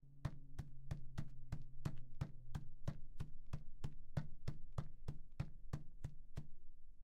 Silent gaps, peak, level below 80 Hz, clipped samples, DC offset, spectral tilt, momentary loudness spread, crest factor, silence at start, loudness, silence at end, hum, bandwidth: none; -28 dBFS; -52 dBFS; under 0.1%; under 0.1%; -7.5 dB/octave; 7 LU; 16 dB; 0.05 s; -53 LUFS; 0 s; none; 7.6 kHz